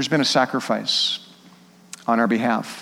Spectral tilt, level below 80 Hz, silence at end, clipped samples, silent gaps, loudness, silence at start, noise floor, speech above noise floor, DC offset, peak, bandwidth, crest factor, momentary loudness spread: -3.5 dB/octave; -74 dBFS; 0 s; under 0.1%; none; -21 LUFS; 0 s; -49 dBFS; 29 dB; under 0.1%; -4 dBFS; 16 kHz; 18 dB; 11 LU